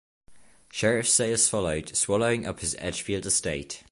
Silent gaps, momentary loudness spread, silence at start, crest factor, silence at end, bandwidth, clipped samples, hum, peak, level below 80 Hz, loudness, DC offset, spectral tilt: none; 10 LU; 0.3 s; 18 dB; 0.1 s; 11.5 kHz; under 0.1%; none; -10 dBFS; -50 dBFS; -25 LUFS; under 0.1%; -3 dB/octave